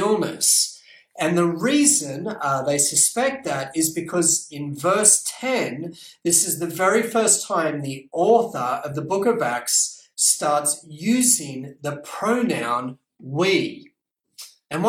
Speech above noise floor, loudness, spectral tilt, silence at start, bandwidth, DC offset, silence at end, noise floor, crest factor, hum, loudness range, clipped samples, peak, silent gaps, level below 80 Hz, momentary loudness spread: 37 dB; -20 LUFS; -2.5 dB/octave; 0 s; 17 kHz; under 0.1%; 0 s; -59 dBFS; 22 dB; none; 3 LU; under 0.1%; 0 dBFS; none; -66 dBFS; 13 LU